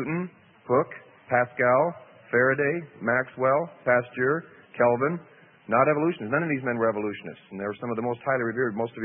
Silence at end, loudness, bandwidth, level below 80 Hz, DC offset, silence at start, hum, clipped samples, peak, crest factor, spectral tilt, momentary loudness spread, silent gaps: 0 s; -25 LUFS; 3.7 kHz; -70 dBFS; under 0.1%; 0 s; none; under 0.1%; -8 dBFS; 18 dB; -11.5 dB/octave; 12 LU; none